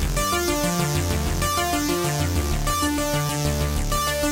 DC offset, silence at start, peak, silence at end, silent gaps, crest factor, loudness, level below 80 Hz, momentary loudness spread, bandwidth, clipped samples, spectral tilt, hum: under 0.1%; 0 s; -10 dBFS; 0 s; none; 12 dB; -23 LUFS; -30 dBFS; 2 LU; 16 kHz; under 0.1%; -4 dB/octave; none